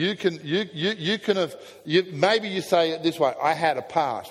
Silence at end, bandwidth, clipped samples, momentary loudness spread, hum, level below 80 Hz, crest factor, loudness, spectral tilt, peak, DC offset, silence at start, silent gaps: 0 s; 15.5 kHz; under 0.1%; 5 LU; none; -68 dBFS; 20 dB; -24 LUFS; -5 dB/octave; -4 dBFS; under 0.1%; 0 s; none